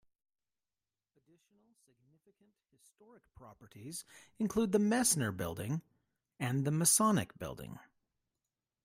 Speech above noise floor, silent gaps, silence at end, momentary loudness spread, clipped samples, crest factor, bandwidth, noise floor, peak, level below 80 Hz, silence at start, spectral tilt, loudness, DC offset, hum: over 54 dB; none; 1.05 s; 18 LU; under 0.1%; 24 dB; 16 kHz; under -90 dBFS; -14 dBFS; -68 dBFS; 3.4 s; -4 dB/octave; -32 LUFS; under 0.1%; none